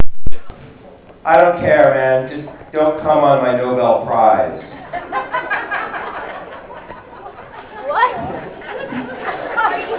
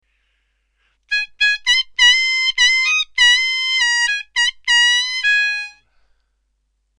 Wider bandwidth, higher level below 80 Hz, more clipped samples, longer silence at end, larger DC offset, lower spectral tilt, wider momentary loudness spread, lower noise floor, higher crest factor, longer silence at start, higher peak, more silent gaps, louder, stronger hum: second, 4 kHz vs 13 kHz; first, -42 dBFS vs -54 dBFS; first, 1% vs under 0.1%; second, 0 s vs 1.3 s; neither; first, -9.5 dB/octave vs 7 dB/octave; first, 22 LU vs 9 LU; second, -40 dBFS vs -68 dBFS; about the same, 14 dB vs 16 dB; second, 0 s vs 1.1 s; about the same, 0 dBFS vs -2 dBFS; neither; about the same, -16 LUFS vs -14 LUFS; neither